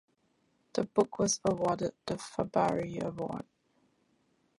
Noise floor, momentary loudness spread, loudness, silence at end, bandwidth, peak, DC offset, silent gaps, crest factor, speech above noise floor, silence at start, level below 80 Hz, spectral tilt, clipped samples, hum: -73 dBFS; 10 LU; -32 LUFS; 1.15 s; 11.5 kHz; -12 dBFS; under 0.1%; none; 22 dB; 42 dB; 0.75 s; -64 dBFS; -4.5 dB/octave; under 0.1%; none